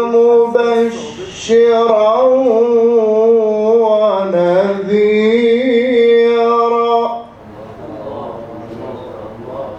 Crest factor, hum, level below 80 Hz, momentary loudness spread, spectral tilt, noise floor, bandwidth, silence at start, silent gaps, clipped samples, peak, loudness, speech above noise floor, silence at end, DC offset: 12 dB; none; -54 dBFS; 18 LU; -5.5 dB/octave; -33 dBFS; 8.2 kHz; 0 s; none; under 0.1%; 0 dBFS; -12 LUFS; 23 dB; 0 s; under 0.1%